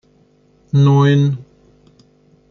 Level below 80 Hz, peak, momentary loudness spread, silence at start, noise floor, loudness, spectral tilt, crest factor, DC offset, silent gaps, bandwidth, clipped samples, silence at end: -56 dBFS; -2 dBFS; 9 LU; 0.75 s; -54 dBFS; -14 LUFS; -8.5 dB/octave; 14 dB; under 0.1%; none; 6.6 kHz; under 0.1%; 1.1 s